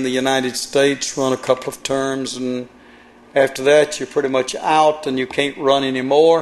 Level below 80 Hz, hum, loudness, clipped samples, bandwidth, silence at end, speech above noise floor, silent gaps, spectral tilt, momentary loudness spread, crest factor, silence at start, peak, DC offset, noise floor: -56 dBFS; none; -18 LUFS; under 0.1%; 12.5 kHz; 0 s; 28 dB; none; -3.5 dB/octave; 9 LU; 16 dB; 0 s; -2 dBFS; under 0.1%; -45 dBFS